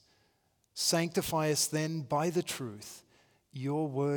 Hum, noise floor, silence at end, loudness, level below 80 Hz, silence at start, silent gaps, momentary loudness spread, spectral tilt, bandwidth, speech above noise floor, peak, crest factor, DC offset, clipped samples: none; -73 dBFS; 0 s; -32 LUFS; -68 dBFS; 0.75 s; none; 18 LU; -4 dB/octave; over 20 kHz; 41 dB; -16 dBFS; 18 dB; under 0.1%; under 0.1%